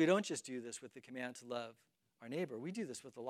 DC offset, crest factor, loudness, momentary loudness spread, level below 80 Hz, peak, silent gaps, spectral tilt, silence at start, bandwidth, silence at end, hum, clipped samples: under 0.1%; 22 dB; -43 LUFS; 13 LU; under -90 dBFS; -20 dBFS; none; -4.5 dB/octave; 0 s; 14 kHz; 0 s; none; under 0.1%